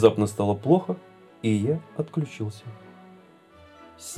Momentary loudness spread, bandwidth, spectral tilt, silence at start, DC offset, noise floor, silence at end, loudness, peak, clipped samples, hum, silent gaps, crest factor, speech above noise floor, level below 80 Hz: 20 LU; 14 kHz; -7 dB/octave; 0 s; under 0.1%; -52 dBFS; 0 s; -26 LUFS; -2 dBFS; under 0.1%; none; none; 24 dB; 29 dB; -66 dBFS